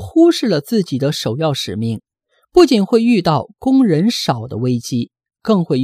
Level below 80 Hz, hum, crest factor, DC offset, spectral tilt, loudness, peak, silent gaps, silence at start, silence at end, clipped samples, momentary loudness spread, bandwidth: -50 dBFS; none; 16 dB; under 0.1%; -6 dB/octave; -16 LUFS; 0 dBFS; none; 0 s; 0 s; under 0.1%; 11 LU; 15.5 kHz